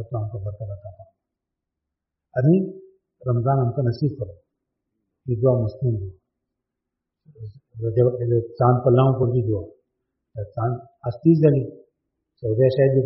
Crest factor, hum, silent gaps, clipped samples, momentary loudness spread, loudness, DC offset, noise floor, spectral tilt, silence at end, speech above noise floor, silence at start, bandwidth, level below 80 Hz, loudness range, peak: 18 dB; none; none; under 0.1%; 19 LU; -21 LUFS; under 0.1%; -84 dBFS; -10 dB/octave; 0 s; 63 dB; 0 s; 5.8 kHz; -54 dBFS; 6 LU; -4 dBFS